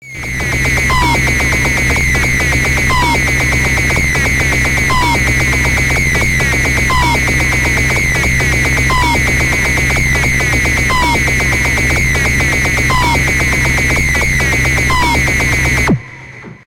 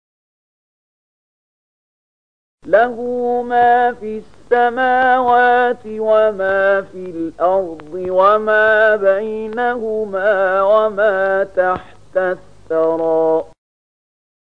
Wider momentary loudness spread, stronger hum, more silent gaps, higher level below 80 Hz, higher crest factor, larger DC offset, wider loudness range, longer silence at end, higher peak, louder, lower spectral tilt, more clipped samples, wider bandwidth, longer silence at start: second, 0 LU vs 11 LU; second, none vs 50 Hz at -55 dBFS; neither; first, -20 dBFS vs -54 dBFS; about the same, 12 dB vs 16 dB; second, under 0.1% vs 0.8%; second, 0 LU vs 4 LU; second, 0.25 s vs 1.1 s; about the same, -2 dBFS vs 0 dBFS; first, -11 LUFS vs -15 LUFS; second, -4 dB/octave vs -6 dB/octave; neither; first, 16 kHz vs 7.4 kHz; second, 0 s vs 2.65 s